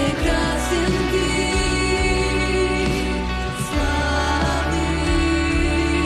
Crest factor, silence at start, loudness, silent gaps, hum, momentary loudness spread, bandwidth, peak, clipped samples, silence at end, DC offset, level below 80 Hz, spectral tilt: 10 dB; 0 s; -20 LUFS; none; none; 3 LU; 13 kHz; -8 dBFS; under 0.1%; 0 s; under 0.1%; -26 dBFS; -5 dB/octave